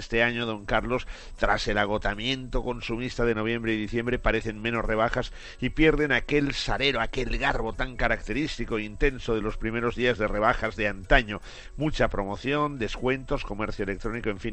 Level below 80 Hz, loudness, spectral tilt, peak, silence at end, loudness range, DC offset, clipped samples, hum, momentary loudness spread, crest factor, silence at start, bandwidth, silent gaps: -34 dBFS; -27 LUFS; -5.5 dB/octave; -4 dBFS; 0 s; 2 LU; under 0.1%; under 0.1%; none; 8 LU; 24 dB; 0 s; 8.6 kHz; none